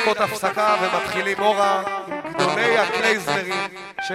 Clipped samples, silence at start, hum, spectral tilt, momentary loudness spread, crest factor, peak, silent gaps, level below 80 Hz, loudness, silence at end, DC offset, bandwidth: under 0.1%; 0 s; none; -3.5 dB/octave; 9 LU; 18 dB; -2 dBFS; none; -62 dBFS; -21 LUFS; 0 s; under 0.1%; 16 kHz